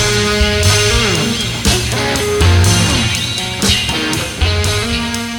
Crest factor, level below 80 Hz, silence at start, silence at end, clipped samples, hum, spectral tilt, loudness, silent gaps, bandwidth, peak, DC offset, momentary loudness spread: 14 dB; -24 dBFS; 0 s; 0 s; under 0.1%; none; -3.5 dB/octave; -13 LUFS; none; 18.5 kHz; 0 dBFS; under 0.1%; 5 LU